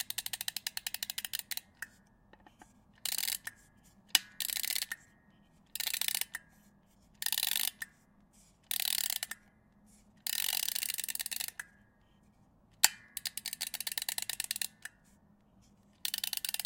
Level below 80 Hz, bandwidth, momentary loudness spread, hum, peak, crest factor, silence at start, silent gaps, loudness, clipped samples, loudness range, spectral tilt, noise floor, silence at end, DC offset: -72 dBFS; 17.5 kHz; 16 LU; none; -4 dBFS; 36 dB; 0 s; none; -34 LUFS; under 0.1%; 4 LU; 2 dB/octave; -66 dBFS; 0 s; under 0.1%